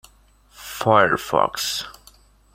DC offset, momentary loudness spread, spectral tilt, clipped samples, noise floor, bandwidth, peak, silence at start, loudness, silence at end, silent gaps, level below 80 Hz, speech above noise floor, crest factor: under 0.1%; 20 LU; -3.5 dB/octave; under 0.1%; -55 dBFS; 16.5 kHz; -2 dBFS; 0.6 s; -20 LUFS; 0.6 s; none; -54 dBFS; 35 dB; 22 dB